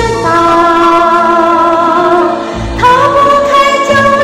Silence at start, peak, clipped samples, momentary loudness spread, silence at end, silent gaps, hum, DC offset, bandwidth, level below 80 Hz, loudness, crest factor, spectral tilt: 0 s; 0 dBFS; 0.2%; 4 LU; 0 s; none; none; under 0.1%; 15 kHz; -30 dBFS; -7 LUFS; 8 dB; -5 dB/octave